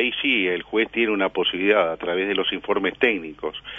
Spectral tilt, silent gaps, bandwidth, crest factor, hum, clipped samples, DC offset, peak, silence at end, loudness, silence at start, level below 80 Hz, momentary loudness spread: -6 dB/octave; none; 5.8 kHz; 18 dB; none; under 0.1%; under 0.1%; -6 dBFS; 0 s; -22 LUFS; 0 s; -56 dBFS; 5 LU